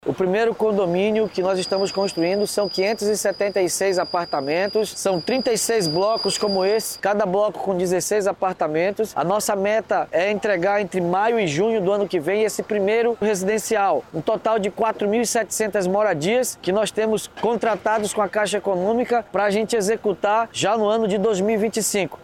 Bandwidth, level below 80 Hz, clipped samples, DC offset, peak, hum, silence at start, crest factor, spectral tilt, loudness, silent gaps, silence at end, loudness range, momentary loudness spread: 17 kHz; -58 dBFS; under 0.1%; under 0.1%; -10 dBFS; none; 0.05 s; 12 dB; -4 dB/octave; -21 LUFS; none; 0 s; 1 LU; 3 LU